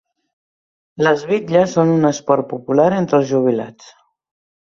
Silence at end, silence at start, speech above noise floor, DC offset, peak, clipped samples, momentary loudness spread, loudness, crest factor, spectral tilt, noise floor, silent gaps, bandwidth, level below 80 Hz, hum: 1 s; 1 s; over 74 dB; under 0.1%; -2 dBFS; under 0.1%; 5 LU; -16 LUFS; 16 dB; -6.5 dB/octave; under -90 dBFS; none; 7.6 kHz; -60 dBFS; none